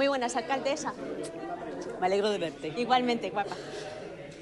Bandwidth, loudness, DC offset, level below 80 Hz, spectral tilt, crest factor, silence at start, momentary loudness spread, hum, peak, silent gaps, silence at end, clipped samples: 12 kHz; -31 LUFS; under 0.1%; -66 dBFS; -4 dB/octave; 18 dB; 0 s; 13 LU; none; -14 dBFS; none; 0 s; under 0.1%